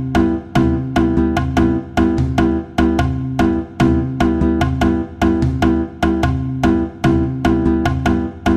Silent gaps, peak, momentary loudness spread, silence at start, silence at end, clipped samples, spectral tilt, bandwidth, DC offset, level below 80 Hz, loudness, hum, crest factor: none; -2 dBFS; 2 LU; 0 s; 0 s; under 0.1%; -7.5 dB/octave; 13.5 kHz; under 0.1%; -26 dBFS; -17 LUFS; none; 12 dB